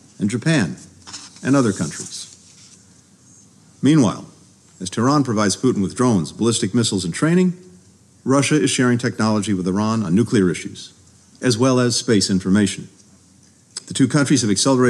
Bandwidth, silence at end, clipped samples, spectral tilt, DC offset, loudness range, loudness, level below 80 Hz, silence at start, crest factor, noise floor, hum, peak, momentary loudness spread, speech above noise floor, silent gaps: 12.5 kHz; 0 s; under 0.1%; -5 dB/octave; under 0.1%; 4 LU; -18 LUFS; -60 dBFS; 0.2 s; 14 dB; -51 dBFS; none; -4 dBFS; 16 LU; 34 dB; none